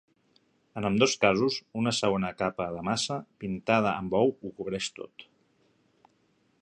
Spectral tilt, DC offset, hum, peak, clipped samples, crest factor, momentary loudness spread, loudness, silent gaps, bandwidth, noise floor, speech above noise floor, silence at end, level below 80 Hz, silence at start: -4.5 dB/octave; under 0.1%; none; -6 dBFS; under 0.1%; 24 dB; 12 LU; -28 LUFS; none; 11 kHz; -69 dBFS; 41 dB; 1.4 s; -60 dBFS; 0.75 s